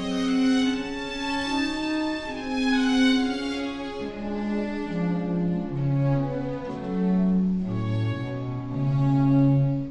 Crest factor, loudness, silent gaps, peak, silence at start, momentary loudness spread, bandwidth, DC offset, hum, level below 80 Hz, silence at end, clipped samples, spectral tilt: 14 dB; -25 LUFS; none; -10 dBFS; 0 s; 10 LU; 10.5 kHz; under 0.1%; none; -46 dBFS; 0 s; under 0.1%; -7 dB/octave